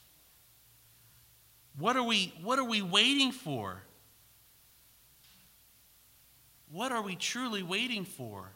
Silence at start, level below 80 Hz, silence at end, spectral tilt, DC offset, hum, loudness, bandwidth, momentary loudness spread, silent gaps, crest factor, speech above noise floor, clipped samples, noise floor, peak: 1.75 s; -76 dBFS; 0.05 s; -3 dB/octave; under 0.1%; none; -31 LUFS; 16 kHz; 18 LU; none; 26 dB; 30 dB; under 0.1%; -63 dBFS; -10 dBFS